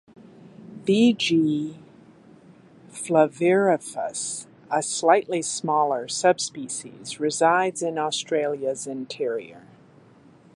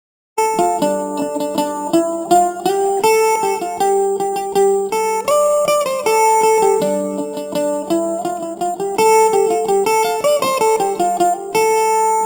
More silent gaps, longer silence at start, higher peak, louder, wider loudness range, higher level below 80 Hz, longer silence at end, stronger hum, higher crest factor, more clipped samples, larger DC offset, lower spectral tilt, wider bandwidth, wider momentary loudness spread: neither; about the same, 0.4 s vs 0.35 s; about the same, -4 dBFS vs -2 dBFS; second, -23 LUFS vs -16 LUFS; about the same, 3 LU vs 2 LU; second, -72 dBFS vs -62 dBFS; first, 0.95 s vs 0 s; neither; first, 20 dB vs 14 dB; neither; neither; about the same, -4 dB/octave vs -3.5 dB/octave; second, 11.5 kHz vs 16 kHz; first, 13 LU vs 8 LU